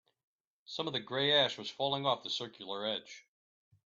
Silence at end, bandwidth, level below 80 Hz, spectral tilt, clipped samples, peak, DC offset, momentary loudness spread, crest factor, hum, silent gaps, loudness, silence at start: 0.7 s; 7.8 kHz; -80 dBFS; -4 dB/octave; under 0.1%; -16 dBFS; under 0.1%; 14 LU; 20 dB; none; none; -33 LUFS; 0.7 s